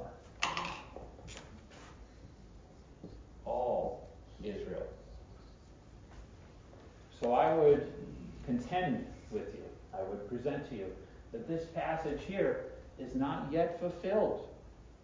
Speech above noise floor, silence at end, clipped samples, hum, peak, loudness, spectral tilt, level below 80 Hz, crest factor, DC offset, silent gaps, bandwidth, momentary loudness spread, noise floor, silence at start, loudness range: 22 dB; 0.05 s; under 0.1%; none; -16 dBFS; -36 LUFS; -6 dB/octave; -56 dBFS; 22 dB; under 0.1%; none; 7.6 kHz; 23 LU; -56 dBFS; 0 s; 10 LU